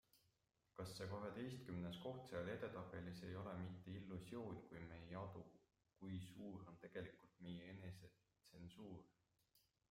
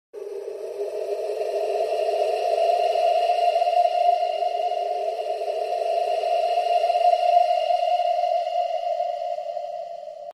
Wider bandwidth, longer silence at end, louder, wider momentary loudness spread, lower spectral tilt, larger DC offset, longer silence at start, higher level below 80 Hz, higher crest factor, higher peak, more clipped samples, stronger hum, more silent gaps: first, 16 kHz vs 12.5 kHz; first, 0.35 s vs 0 s; second, -54 LUFS vs -23 LUFS; about the same, 11 LU vs 11 LU; first, -6.5 dB/octave vs -1 dB/octave; neither; about the same, 0.15 s vs 0.15 s; about the same, -78 dBFS vs -74 dBFS; about the same, 18 dB vs 16 dB; second, -38 dBFS vs -6 dBFS; neither; neither; neither